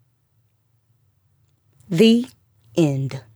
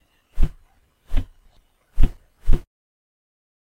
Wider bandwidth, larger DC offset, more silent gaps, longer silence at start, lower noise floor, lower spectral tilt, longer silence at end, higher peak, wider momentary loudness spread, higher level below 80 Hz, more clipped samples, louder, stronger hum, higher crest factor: first, 15 kHz vs 3.7 kHz; neither; neither; first, 1.9 s vs 0.35 s; first, -65 dBFS vs -58 dBFS; about the same, -6.5 dB/octave vs -7.5 dB/octave; second, 0.15 s vs 1.05 s; about the same, -4 dBFS vs -2 dBFS; about the same, 12 LU vs 14 LU; second, -66 dBFS vs -22 dBFS; neither; first, -19 LUFS vs -29 LUFS; neither; about the same, 20 dB vs 18 dB